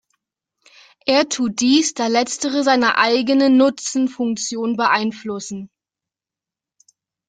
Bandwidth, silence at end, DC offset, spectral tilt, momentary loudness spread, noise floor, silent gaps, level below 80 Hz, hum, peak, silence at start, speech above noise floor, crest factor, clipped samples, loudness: 9.4 kHz; 1.6 s; under 0.1%; -2.5 dB/octave; 12 LU; -89 dBFS; none; -66 dBFS; none; -2 dBFS; 1.05 s; 71 dB; 18 dB; under 0.1%; -18 LUFS